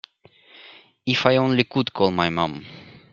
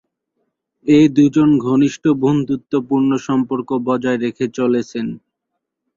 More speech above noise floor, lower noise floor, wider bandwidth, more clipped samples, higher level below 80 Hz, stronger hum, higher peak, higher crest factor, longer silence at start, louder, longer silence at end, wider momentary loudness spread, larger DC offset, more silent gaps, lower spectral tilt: second, 33 dB vs 62 dB; second, -54 dBFS vs -77 dBFS; about the same, 7.4 kHz vs 7.4 kHz; neither; about the same, -58 dBFS vs -56 dBFS; neither; about the same, 0 dBFS vs -2 dBFS; first, 22 dB vs 14 dB; second, 0.65 s vs 0.85 s; second, -21 LUFS vs -16 LUFS; second, 0.15 s vs 0.8 s; first, 14 LU vs 10 LU; neither; neither; about the same, -6 dB/octave vs -7 dB/octave